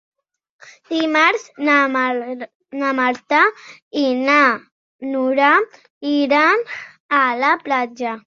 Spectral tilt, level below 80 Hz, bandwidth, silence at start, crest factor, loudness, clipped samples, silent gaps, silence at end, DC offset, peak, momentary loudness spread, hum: -3 dB/octave; -70 dBFS; 7.4 kHz; 0.65 s; 18 dB; -17 LUFS; under 0.1%; 2.55-2.60 s, 3.82-3.91 s, 4.72-4.99 s, 5.90-6.01 s, 7.00-7.09 s; 0.1 s; under 0.1%; -2 dBFS; 15 LU; none